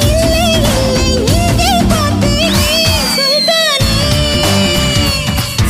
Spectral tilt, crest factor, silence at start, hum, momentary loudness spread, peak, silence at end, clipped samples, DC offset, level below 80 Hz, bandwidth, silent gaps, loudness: -4 dB/octave; 12 dB; 0 s; none; 2 LU; 0 dBFS; 0 s; under 0.1%; under 0.1%; -20 dBFS; 16 kHz; none; -11 LUFS